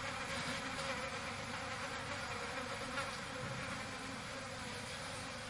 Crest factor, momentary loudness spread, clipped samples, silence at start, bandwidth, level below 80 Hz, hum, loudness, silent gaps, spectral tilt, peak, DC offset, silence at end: 18 dB; 4 LU; under 0.1%; 0 s; 11.5 kHz; -62 dBFS; none; -42 LUFS; none; -3 dB/octave; -26 dBFS; under 0.1%; 0 s